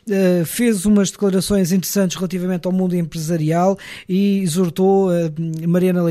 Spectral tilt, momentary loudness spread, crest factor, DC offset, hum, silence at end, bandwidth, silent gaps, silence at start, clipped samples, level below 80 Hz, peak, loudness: -6 dB/octave; 6 LU; 12 dB; under 0.1%; none; 0 s; 15.5 kHz; none; 0.05 s; under 0.1%; -48 dBFS; -6 dBFS; -18 LUFS